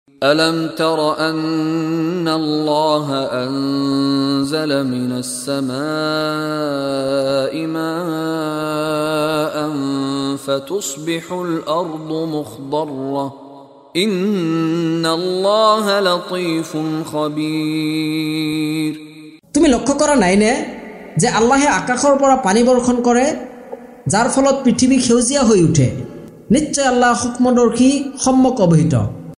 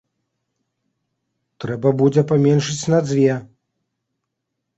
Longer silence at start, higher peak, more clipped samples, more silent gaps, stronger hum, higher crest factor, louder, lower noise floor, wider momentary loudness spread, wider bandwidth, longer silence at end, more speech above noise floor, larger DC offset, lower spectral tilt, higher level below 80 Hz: second, 0.2 s vs 1.6 s; first, 0 dBFS vs -4 dBFS; neither; neither; neither; about the same, 16 dB vs 18 dB; about the same, -17 LUFS vs -17 LUFS; second, -40 dBFS vs -78 dBFS; second, 9 LU vs 13 LU; first, 15 kHz vs 8.2 kHz; second, 0.05 s vs 1.35 s; second, 24 dB vs 61 dB; neither; second, -5 dB/octave vs -6.5 dB/octave; first, -46 dBFS vs -58 dBFS